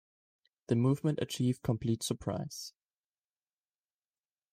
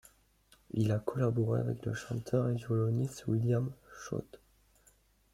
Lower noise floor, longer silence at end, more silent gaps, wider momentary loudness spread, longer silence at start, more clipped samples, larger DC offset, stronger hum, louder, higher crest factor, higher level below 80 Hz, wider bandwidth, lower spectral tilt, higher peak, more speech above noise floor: first, under -90 dBFS vs -67 dBFS; first, 1.85 s vs 0.95 s; neither; about the same, 12 LU vs 10 LU; about the same, 0.7 s vs 0.75 s; neither; neither; neither; about the same, -33 LUFS vs -34 LUFS; about the same, 18 dB vs 18 dB; about the same, -64 dBFS vs -64 dBFS; first, 15.5 kHz vs 13.5 kHz; second, -6 dB/octave vs -8 dB/octave; about the same, -18 dBFS vs -16 dBFS; first, over 58 dB vs 35 dB